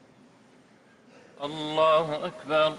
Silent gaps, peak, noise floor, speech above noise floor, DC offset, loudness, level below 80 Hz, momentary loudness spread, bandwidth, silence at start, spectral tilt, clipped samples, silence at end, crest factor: none; -12 dBFS; -57 dBFS; 32 dB; under 0.1%; -26 LUFS; -70 dBFS; 14 LU; 11 kHz; 1.4 s; -5 dB/octave; under 0.1%; 0 s; 16 dB